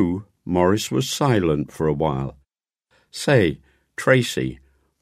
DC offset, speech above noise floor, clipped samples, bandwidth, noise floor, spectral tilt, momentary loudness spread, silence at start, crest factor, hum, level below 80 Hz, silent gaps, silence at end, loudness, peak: under 0.1%; 53 dB; under 0.1%; 15.5 kHz; -73 dBFS; -5.5 dB/octave; 13 LU; 0 s; 20 dB; none; -46 dBFS; none; 0.45 s; -21 LUFS; -2 dBFS